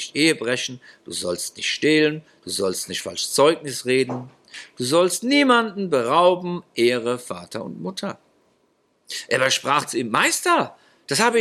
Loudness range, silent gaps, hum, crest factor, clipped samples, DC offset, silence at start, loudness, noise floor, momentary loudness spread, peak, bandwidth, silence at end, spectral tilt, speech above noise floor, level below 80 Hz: 5 LU; none; none; 20 dB; under 0.1%; under 0.1%; 0 s; -21 LUFS; -65 dBFS; 14 LU; -2 dBFS; 15 kHz; 0 s; -3 dB/octave; 44 dB; -70 dBFS